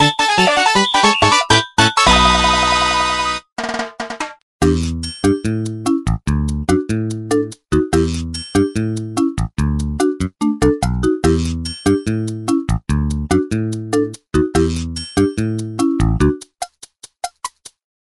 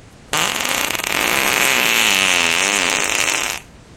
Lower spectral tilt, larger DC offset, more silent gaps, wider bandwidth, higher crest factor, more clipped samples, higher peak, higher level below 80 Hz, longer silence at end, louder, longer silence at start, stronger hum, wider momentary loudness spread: first, -4.5 dB/octave vs 0 dB/octave; neither; first, 3.52-3.56 s, 4.42-4.59 s vs none; second, 12.5 kHz vs over 20 kHz; about the same, 16 dB vs 18 dB; neither; about the same, 0 dBFS vs 0 dBFS; first, -28 dBFS vs -48 dBFS; first, 0.35 s vs 0 s; about the same, -16 LUFS vs -15 LUFS; second, 0 s vs 0.3 s; neither; first, 12 LU vs 7 LU